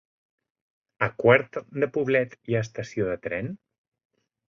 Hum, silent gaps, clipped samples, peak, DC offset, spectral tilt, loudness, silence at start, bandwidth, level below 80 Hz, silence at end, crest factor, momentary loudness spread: none; none; under 0.1%; -4 dBFS; under 0.1%; -7 dB/octave; -25 LUFS; 1 s; 7.4 kHz; -60 dBFS; 0.95 s; 24 dB; 13 LU